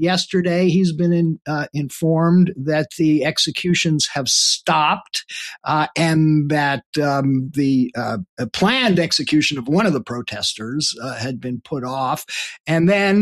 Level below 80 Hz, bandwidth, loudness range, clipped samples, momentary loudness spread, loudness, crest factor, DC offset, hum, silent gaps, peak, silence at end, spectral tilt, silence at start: -56 dBFS; 13.5 kHz; 3 LU; under 0.1%; 10 LU; -18 LUFS; 14 dB; under 0.1%; none; 6.86-6.93 s, 8.29-8.37 s, 12.60-12.64 s; -4 dBFS; 0 s; -4.5 dB/octave; 0 s